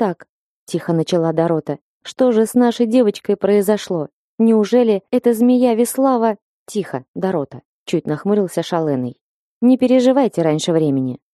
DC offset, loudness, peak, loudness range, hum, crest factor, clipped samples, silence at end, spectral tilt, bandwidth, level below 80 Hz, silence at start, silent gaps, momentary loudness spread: under 0.1%; -17 LUFS; -2 dBFS; 4 LU; none; 14 dB; under 0.1%; 0.15 s; -6.5 dB/octave; 13 kHz; -64 dBFS; 0 s; 0.29-0.67 s, 1.81-2.01 s, 4.13-4.38 s, 6.42-6.66 s, 7.08-7.14 s, 7.65-7.86 s, 9.21-9.61 s; 13 LU